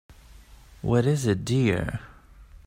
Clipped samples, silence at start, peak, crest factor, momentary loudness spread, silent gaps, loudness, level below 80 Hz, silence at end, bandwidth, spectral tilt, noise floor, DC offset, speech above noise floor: under 0.1%; 0.35 s; -8 dBFS; 18 dB; 12 LU; none; -25 LUFS; -48 dBFS; 0.1 s; 16 kHz; -6.5 dB/octave; -49 dBFS; under 0.1%; 26 dB